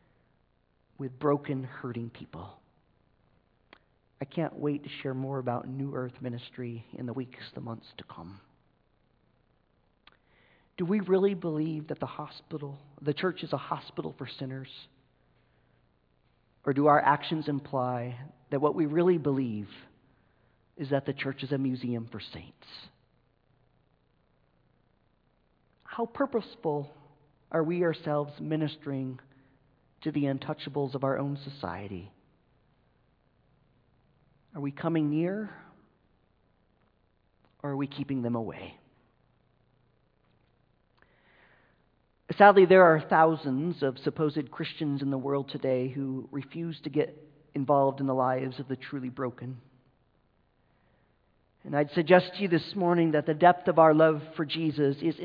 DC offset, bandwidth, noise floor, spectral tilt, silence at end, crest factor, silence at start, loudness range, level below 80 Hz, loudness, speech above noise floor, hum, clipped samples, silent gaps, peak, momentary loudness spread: under 0.1%; 5.2 kHz; -70 dBFS; -9.5 dB/octave; 0 s; 26 dB; 1 s; 16 LU; -70 dBFS; -29 LUFS; 42 dB; none; under 0.1%; none; -4 dBFS; 20 LU